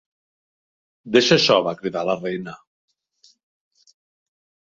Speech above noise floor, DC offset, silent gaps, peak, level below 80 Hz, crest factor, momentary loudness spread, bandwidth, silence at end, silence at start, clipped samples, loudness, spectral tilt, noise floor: 39 dB; under 0.1%; none; -2 dBFS; -64 dBFS; 22 dB; 15 LU; 7.8 kHz; 2.15 s; 1.05 s; under 0.1%; -19 LUFS; -4 dB/octave; -59 dBFS